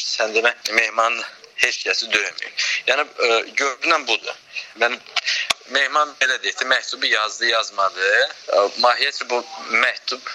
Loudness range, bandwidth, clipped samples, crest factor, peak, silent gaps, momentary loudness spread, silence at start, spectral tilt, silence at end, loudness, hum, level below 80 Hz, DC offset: 2 LU; 15 kHz; under 0.1%; 20 dB; 0 dBFS; none; 6 LU; 0 s; 1 dB/octave; 0 s; -19 LUFS; none; -68 dBFS; under 0.1%